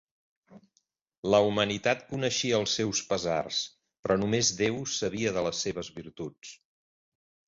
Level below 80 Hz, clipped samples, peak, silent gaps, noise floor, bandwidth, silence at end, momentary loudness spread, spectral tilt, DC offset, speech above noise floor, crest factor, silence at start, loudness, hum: -60 dBFS; under 0.1%; -10 dBFS; 1.17-1.23 s, 3.99-4.03 s; -75 dBFS; 8 kHz; 0.95 s; 16 LU; -3.5 dB/octave; under 0.1%; 46 dB; 20 dB; 0.5 s; -28 LUFS; none